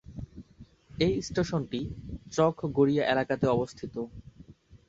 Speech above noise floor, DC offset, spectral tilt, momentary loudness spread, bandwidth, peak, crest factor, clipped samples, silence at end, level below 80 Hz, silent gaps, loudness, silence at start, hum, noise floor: 26 dB; under 0.1%; -6 dB/octave; 19 LU; 8 kHz; -10 dBFS; 20 dB; under 0.1%; 0.15 s; -50 dBFS; none; -29 LUFS; 0.1 s; none; -54 dBFS